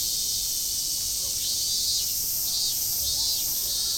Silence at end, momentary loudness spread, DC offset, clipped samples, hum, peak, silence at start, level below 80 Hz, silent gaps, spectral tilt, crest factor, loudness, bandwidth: 0 s; 2 LU; under 0.1%; under 0.1%; none; -12 dBFS; 0 s; -50 dBFS; none; 1 dB/octave; 14 dB; -24 LUFS; over 20 kHz